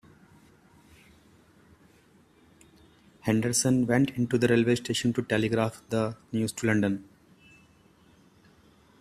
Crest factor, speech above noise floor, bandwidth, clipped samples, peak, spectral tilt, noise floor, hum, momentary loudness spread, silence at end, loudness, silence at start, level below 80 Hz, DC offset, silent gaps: 20 dB; 34 dB; 15 kHz; under 0.1%; -10 dBFS; -5 dB/octave; -60 dBFS; none; 7 LU; 2 s; -27 LUFS; 3.25 s; -62 dBFS; under 0.1%; none